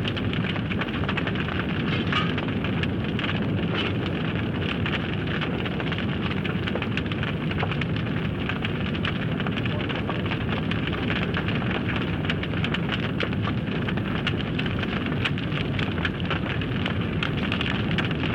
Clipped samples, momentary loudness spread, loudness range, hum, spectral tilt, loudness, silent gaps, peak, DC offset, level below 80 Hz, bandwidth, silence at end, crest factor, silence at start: under 0.1%; 2 LU; 1 LU; none; -7.5 dB/octave; -26 LUFS; none; -10 dBFS; under 0.1%; -42 dBFS; 9 kHz; 0 s; 16 dB; 0 s